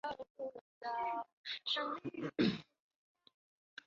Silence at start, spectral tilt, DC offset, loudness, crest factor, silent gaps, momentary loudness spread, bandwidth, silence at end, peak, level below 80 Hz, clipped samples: 0.05 s; -3 dB/octave; under 0.1%; -40 LUFS; 20 dB; 0.30-0.35 s, 0.61-0.81 s, 1.33-1.44 s; 12 LU; 7.4 kHz; 1.25 s; -22 dBFS; -74 dBFS; under 0.1%